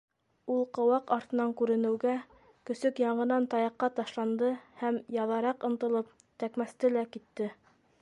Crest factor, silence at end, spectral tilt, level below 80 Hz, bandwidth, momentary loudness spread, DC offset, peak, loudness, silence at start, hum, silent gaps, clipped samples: 18 dB; 0.5 s; -6.5 dB/octave; -78 dBFS; 11 kHz; 10 LU; under 0.1%; -14 dBFS; -31 LUFS; 0.45 s; none; none; under 0.1%